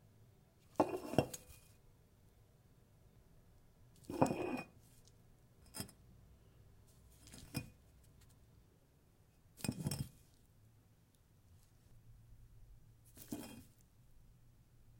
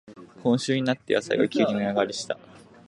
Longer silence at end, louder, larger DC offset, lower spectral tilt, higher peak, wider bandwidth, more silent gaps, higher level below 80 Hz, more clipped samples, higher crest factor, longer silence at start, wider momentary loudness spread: second, 0 s vs 0.3 s; second, -43 LUFS vs -25 LUFS; neither; about the same, -5.5 dB/octave vs -5 dB/octave; second, -14 dBFS vs -8 dBFS; first, 16.5 kHz vs 11 kHz; neither; about the same, -68 dBFS vs -68 dBFS; neither; first, 34 dB vs 18 dB; first, 0.2 s vs 0.05 s; first, 28 LU vs 8 LU